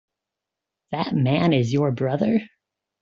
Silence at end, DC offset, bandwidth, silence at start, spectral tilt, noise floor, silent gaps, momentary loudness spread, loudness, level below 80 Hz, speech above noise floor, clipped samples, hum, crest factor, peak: 0.55 s; under 0.1%; 7.6 kHz; 0.9 s; -6.5 dB/octave; -85 dBFS; none; 7 LU; -22 LUFS; -60 dBFS; 65 dB; under 0.1%; none; 16 dB; -6 dBFS